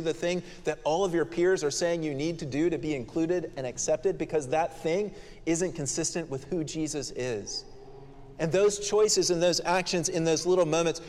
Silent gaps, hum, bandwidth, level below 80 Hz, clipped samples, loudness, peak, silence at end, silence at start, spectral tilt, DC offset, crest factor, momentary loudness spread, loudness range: none; none; 14 kHz; -52 dBFS; under 0.1%; -28 LUFS; -12 dBFS; 0 s; 0 s; -4 dB/octave; under 0.1%; 16 dB; 9 LU; 5 LU